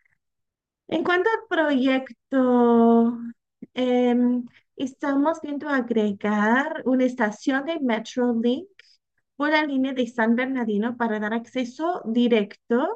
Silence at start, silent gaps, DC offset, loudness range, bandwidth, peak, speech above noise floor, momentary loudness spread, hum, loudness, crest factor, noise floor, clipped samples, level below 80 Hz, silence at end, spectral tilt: 0.9 s; none; under 0.1%; 3 LU; 8 kHz; -8 dBFS; 60 dB; 9 LU; none; -23 LUFS; 16 dB; -83 dBFS; under 0.1%; -76 dBFS; 0 s; -6 dB/octave